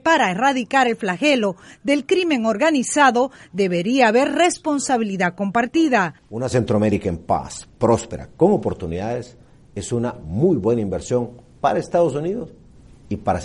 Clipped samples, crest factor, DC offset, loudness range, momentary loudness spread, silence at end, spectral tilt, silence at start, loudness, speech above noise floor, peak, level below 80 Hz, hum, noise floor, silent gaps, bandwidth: under 0.1%; 18 dB; under 0.1%; 4 LU; 11 LU; 0 s; -5 dB/octave; 0.05 s; -20 LUFS; 26 dB; -2 dBFS; -48 dBFS; none; -46 dBFS; none; 11.5 kHz